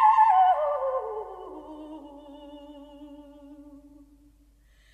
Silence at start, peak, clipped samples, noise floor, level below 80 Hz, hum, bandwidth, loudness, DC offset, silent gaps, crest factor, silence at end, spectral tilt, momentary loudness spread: 0 s; -10 dBFS; under 0.1%; -59 dBFS; -60 dBFS; none; 8.2 kHz; -23 LUFS; under 0.1%; none; 18 dB; 1.4 s; -5 dB/octave; 28 LU